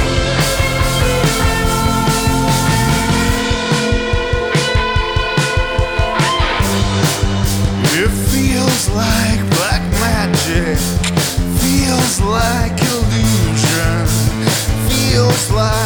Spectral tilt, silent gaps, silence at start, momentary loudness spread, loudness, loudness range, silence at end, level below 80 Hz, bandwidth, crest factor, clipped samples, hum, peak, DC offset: -4.5 dB/octave; none; 0 s; 2 LU; -14 LUFS; 1 LU; 0 s; -22 dBFS; over 20 kHz; 12 dB; under 0.1%; none; -2 dBFS; under 0.1%